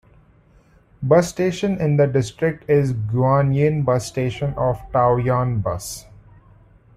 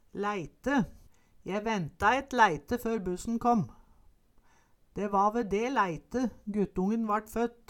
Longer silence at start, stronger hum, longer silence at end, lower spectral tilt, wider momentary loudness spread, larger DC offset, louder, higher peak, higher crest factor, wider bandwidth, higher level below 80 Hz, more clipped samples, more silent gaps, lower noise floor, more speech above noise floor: first, 1 s vs 0.15 s; neither; first, 0.95 s vs 0.15 s; about the same, -7 dB/octave vs -6 dB/octave; second, 7 LU vs 10 LU; neither; first, -20 LUFS vs -30 LUFS; first, -2 dBFS vs -10 dBFS; about the same, 18 dB vs 20 dB; second, 14 kHz vs 17.5 kHz; first, -46 dBFS vs -54 dBFS; neither; neither; second, -53 dBFS vs -63 dBFS; about the same, 34 dB vs 33 dB